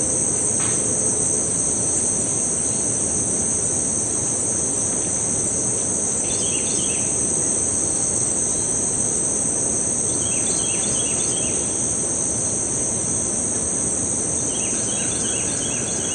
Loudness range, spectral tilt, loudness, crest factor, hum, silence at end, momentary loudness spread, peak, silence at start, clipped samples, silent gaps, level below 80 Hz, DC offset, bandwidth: 1 LU; -2.5 dB/octave; -19 LUFS; 14 dB; none; 0 s; 2 LU; -8 dBFS; 0 s; under 0.1%; none; -48 dBFS; under 0.1%; 11.5 kHz